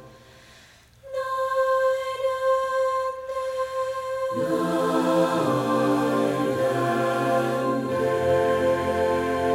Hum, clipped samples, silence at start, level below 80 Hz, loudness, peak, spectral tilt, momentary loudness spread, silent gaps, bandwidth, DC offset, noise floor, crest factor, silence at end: none; under 0.1%; 0 s; -56 dBFS; -24 LUFS; -10 dBFS; -6 dB/octave; 7 LU; none; 16 kHz; under 0.1%; -52 dBFS; 14 dB; 0 s